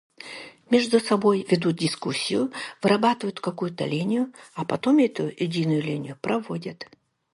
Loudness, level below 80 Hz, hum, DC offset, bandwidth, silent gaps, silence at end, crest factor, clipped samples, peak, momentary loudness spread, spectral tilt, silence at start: -24 LUFS; -68 dBFS; none; under 0.1%; 11.5 kHz; none; 0.5 s; 18 dB; under 0.1%; -6 dBFS; 14 LU; -5.5 dB/octave; 0.2 s